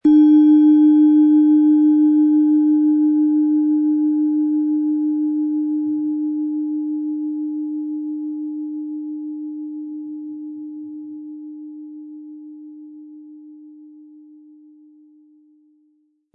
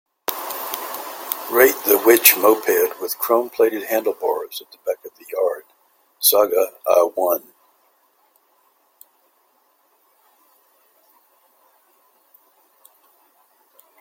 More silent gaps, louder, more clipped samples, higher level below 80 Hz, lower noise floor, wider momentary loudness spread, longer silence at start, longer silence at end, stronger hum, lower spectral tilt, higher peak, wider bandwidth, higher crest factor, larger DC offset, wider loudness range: neither; about the same, -17 LUFS vs -18 LUFS; neither; about the same, -70 dBFS vs -68 dBFS; about the same, -63 dBFS vs -62 dBFS; first, 23 LU vs 15 LU; second, 0.05 s vs 0.3 s; second, 2.5 s vs 6.6 s; neither; first, -9.5 dB/octave vs -1 dB/octave; second, -6 dBFS vs 0 dBFS; second, 3.5 kHz vs 17 kHz; second, 12 dB vs 22 dB; neither; first, 22 LU vs 8 LU